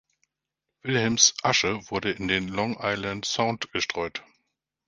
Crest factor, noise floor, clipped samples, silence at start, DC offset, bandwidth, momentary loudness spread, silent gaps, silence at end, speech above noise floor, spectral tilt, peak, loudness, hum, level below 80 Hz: 24 dB; -85 dBFS; under 0.1%; 0.85 s; under 0.1%; 10 kHz; 11 LU; none; 0.65 s; 59 dB; -2.5 dB/octave; -2 dBFS; -25 LUFS; none; -56 dBFS